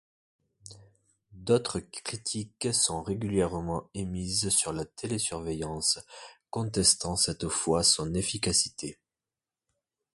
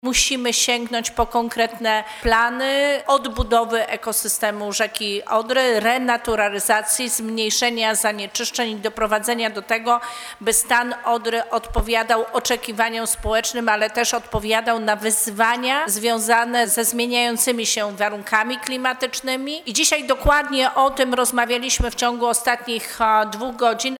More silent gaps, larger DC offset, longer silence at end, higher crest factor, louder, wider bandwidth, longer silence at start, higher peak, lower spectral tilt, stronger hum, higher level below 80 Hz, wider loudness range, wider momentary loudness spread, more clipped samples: neither; neither; first, 1.2 s vs 0 s; about the same, 22 dB vs 20 dB; second, -28 LUFS vs -19 LUFS; second, 12 kHz vs over 20 kHz; first, 0.65 s vs 0.05 s; second, -10 dBFS vs 0 dBFS; first, -3 dB/octave vs -1.5 dB/octave; neither; second, -52 dBFS vs -38 dBFS; about the same, 4 LU vs 2 LU; first, 13 LU vs 6 LU; neither